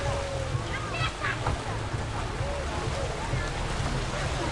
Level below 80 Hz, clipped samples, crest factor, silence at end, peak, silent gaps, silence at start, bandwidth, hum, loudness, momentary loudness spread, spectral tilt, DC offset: -36 dBFS; under 0.1%; 16 dB; 0 s; -14 dBFS; none; 0 s; 11.5 kHz; none; -31 LUFS; 3 LU; -5 dB/octave; under 0.1%